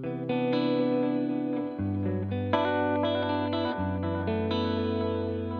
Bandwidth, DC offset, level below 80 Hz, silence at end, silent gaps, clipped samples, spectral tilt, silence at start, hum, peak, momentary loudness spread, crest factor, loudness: 6.2 kHz; under 0.1%; -64 dBFS; 0 s; none; under 0.1%; -9 dB/octave; 0 s; none; -12 dBFS; 5 LU; 16 dB; -29 LUFS